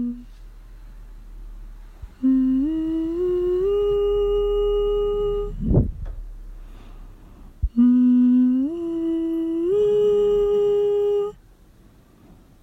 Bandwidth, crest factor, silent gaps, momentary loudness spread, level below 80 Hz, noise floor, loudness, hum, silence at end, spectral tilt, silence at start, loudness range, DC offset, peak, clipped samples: 7.6 kHz; 16 dB; none; 11 LU; -34 dBFS; -51 dBFS; -21 LUFS; none; 1.3 s; -9.5 dB/octave; 0 s; 6 LU; under 0.1%; -6 dBFS; under 0.1%